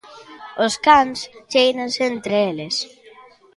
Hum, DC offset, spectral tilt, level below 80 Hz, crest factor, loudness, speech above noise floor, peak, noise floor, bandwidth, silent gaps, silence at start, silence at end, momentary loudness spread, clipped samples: none; under 0.1%; -3 dB/octave; -56 dBFS; 20 dB; -18 LUFS; 28 dB; 0 dBFS; -47 dBFS; 11.5 kHz; none; 0.1 s; 0.7 s; 18 LU; under 0.1%